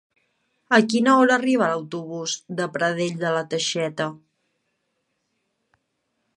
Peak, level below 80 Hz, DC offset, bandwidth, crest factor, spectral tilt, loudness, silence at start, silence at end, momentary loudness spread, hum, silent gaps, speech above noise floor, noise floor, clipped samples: -2 dBFS; -76 dBFS; under 0.1%; 11 kHz; 22 dB; -4 dB/octave; -22 LUFS; 0.7 s; 2.2 s; 12 LU; none; none; 53 dB; -75 dBFS; under 0.1%